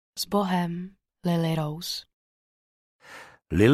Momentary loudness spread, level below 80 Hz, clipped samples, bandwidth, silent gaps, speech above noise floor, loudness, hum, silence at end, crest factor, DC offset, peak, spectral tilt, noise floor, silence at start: 21 LU; -52 dBFS; under 0.1%; 15 kHz; 2.13-2.99 s; 21 dB; -28 LUFS; none; 0 s; 20 dB; under 0.1%; -8 dBFS; -6 dB/octave; -48 dBFS; 0.15 s